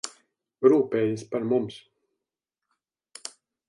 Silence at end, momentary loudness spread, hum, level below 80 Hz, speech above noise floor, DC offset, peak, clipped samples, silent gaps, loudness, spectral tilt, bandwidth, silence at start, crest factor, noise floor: 0.4 s; 20 LU; none; -72 dBFS; 64 dB; under 0.1%; -6 dBFS; under 0.1%; none; -24 LUFS; -6 dB/octave; 11.5 kHz; 0.05 s; 22 dB; -87 dBFS